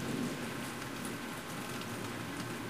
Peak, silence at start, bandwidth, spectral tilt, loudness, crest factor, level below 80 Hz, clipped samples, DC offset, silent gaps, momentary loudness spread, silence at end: -24 dBFS; 0 s; 15.5 kHz; -4 dB/octave; -40 LUFS; 14 dB; -64 dBFS; under 0.1%; 0.1%; none; 3 LU; 0 s